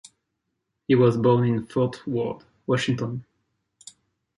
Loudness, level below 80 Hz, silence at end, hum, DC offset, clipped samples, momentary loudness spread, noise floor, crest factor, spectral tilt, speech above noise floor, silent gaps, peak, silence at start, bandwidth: -23 LUFS; -62 dBFS; 1.15 s; none; under 0.1%; under 0.1%; 15 LU; -79 dBFS; 18 dB; -7 dB/octave; 57 dB; none; -6 dBFS; 0.9 s; 11 kHz